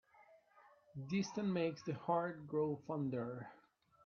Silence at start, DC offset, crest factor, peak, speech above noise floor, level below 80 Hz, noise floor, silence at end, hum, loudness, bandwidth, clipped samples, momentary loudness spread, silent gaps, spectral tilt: 0.2 s; under 0.1%; 18 dB; -24 dBFS; 28 dB; -80 dBFS; -68 dBFS; 0.5 s; none; -41 LUFS; 7 kHz; under 0.1%; 13 LU; none; -6.5 dB/octave